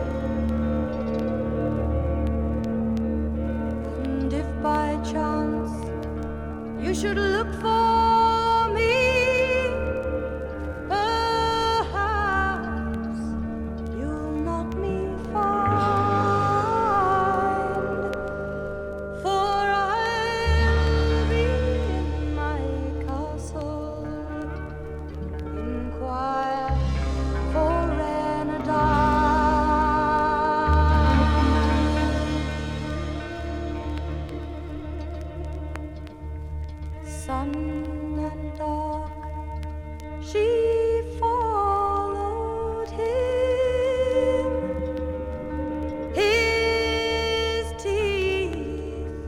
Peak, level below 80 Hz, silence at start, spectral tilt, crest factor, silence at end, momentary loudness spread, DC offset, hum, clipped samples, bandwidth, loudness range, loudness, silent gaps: -8 dBFS; -32 dBFS; 0 s; -6.5 dB/octave; 16 dB; 0 s; 13 LU; under 0.1%; none; under 0.1%; 12 kHz; 10 LU; -25 LUFS; none